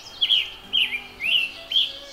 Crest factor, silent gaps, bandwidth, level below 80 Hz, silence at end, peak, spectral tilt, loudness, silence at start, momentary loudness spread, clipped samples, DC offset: 16 dB; none; 16 kHz; -58 dBFS; 0 s; -8 dBFS; 0 dB/octave; -21 LUFS; 0 s; 5 LU; under 0.1%; under 0.1%